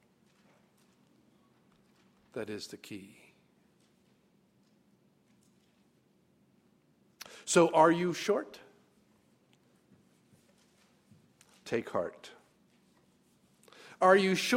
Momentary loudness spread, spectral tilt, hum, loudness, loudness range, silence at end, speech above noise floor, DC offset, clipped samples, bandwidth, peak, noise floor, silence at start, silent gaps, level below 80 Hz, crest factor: 28 LU; -4.5 dB/octave; none; -29 LUFS; 17 LU; 0 s; 40 dB; under 0.1%; under 0.1%; 16 kHz; -10 dBFS; -69 dBFS; 2.35 s; none; -80 dBFS; 26 dB